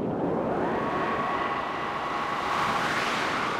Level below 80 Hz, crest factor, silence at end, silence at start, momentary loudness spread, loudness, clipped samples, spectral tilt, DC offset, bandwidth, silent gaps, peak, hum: -54 dBFS; 14 dB; 0 s; 0 s; 4 LU; -27 LUFS; under 0.1%; -4.5 dB/octave; under 0.1%; 16 kHz; none; -14 dBFS; none